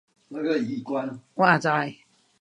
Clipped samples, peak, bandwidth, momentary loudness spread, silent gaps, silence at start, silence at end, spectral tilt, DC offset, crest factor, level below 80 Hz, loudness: under 0.1%; -4 dBFS; 10.5 kHz; 14 LU; none; 0.3 s; 0.45 s; -6 dB/octave; under 0.1%; 22 dB; -74 dBFS; -25 LUFS